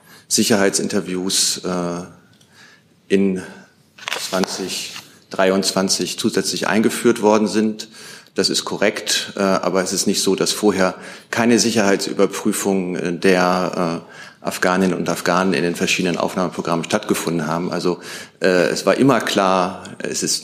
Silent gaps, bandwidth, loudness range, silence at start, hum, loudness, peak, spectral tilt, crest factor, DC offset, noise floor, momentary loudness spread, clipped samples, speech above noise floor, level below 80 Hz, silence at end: none; 15.5 kHz; 4 LU; 0.1 s; none; -18 LUFS; -2 dBFS; -3.5 dB/octave; 18 dB; under 0.1%; -49 dBFS; 11 LU; under 0.1%; 31 dB; -64 dBFS; 0 s